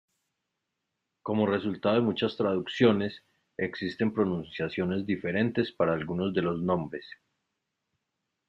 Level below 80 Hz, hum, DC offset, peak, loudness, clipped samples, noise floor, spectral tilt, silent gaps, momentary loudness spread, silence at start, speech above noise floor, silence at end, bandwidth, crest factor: -66 dBFS; none; under 0.1%; -10 dBFS; -29 LUFS; under 0.1%; -84 dBFS; -8 dB/octave; none; 11 LU; 1.25 s; 55 dB; 1.35 s; 7.4 kHz; 20 dB